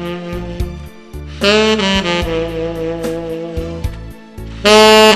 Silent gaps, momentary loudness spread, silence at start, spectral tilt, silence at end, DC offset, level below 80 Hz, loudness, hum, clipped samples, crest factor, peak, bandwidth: none; 24 LU; 0 s; -4 dB/octave; 0 s; under 0.1%; -30 dBFS; -14 LUFS; none; 0.4%; 14 dB; 0 dBFS; 14 kHz